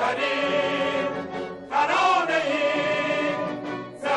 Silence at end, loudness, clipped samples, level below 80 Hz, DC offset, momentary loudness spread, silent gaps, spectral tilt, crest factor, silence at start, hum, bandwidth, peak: 0 s; -24 LUFS; under 0.1%; -64 dBFS; under 0.1%; 11 LU; none; -4 dB/octave; 14 dB; 0 s; none; 11 kHz; -10 dBFS